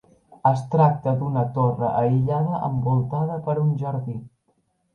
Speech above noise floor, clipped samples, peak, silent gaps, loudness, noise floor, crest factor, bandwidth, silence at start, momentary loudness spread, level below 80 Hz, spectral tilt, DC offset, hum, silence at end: 47 dB; under 0.1%; -6 dBFS; none; -22 LUFS; -68 dBFS; 16 dB; 6.6 kHz; 0.3 s; 7 LU; -54 dBFS; -10.5 dB/octave; under 0.1%; none; 0.65 s